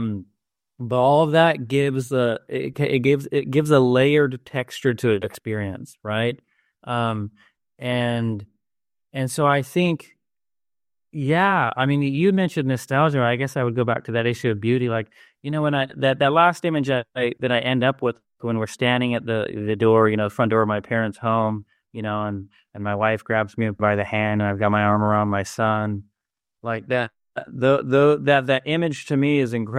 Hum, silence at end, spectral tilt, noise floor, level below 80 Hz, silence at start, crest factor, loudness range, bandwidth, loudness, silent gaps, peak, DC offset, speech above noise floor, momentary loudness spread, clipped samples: none; 0 s; -6.5 dB/octave; under -90 dBFS; -60 dBFS; 0 s; 18 dB; 5 LU; 14.5 kHz; -21 LUFS; none; -2 dBFS; under 0.1%; over 69 dB; 12 LU; under 0.1%